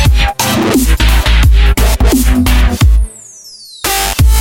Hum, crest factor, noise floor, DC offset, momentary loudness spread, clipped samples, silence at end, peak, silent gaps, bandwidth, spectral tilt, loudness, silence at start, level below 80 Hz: none; 8 dB; -33 dBFS; under 0.1%; 13 LU; under 0.1%; 0 s; 0 dBFS; none; 17 kHz; -4.5 dB/octave; -11 LUFS; 0 s; -10 dBFS